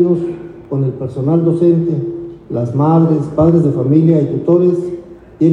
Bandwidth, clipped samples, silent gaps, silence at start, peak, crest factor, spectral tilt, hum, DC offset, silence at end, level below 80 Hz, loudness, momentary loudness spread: 4.1 kHz; under 0.1%; none; 0 s; 0 dBFS; 12 dB; -11.5 dB/octave; none; under 0.1%; 0 s; -44 dBFS; -14 LUFS; 13 LU